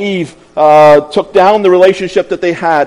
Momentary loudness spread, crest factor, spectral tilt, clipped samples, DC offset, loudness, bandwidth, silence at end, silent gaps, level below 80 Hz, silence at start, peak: 11 LU; 8 dB; -6 dB/octave; 5%; under 0.1%; -8 LUFS; 11 kHz; 0 s; none; -48 dBFS; 0 s; 0 dBFS